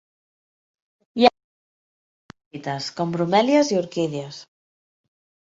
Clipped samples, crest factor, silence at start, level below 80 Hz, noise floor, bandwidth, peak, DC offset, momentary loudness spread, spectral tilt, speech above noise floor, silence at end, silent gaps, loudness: under 0.1%; 22 dB; 1.15 s; -66 dBFS; under -90 dBFS; 8 kHz; -2 dBFS; under 0.1%; 18 LU; -5 dB/octave; over 68 dB; 1 s; 1.44-2.29 s, 2.46-2.51 s; -21 LUFS